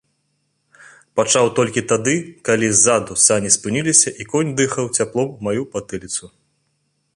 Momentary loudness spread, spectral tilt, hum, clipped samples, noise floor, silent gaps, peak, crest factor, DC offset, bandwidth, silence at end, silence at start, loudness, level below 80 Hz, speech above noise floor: 12 LU; -3 dB/octave; none; under 0.1%; -68 dBFS; none; 0 dBFS; 20 dB; under 0.1%; 11.5 kHz; 0.9 s; 1.15 s; -17 LUFS; -54 dBFS; 51 dB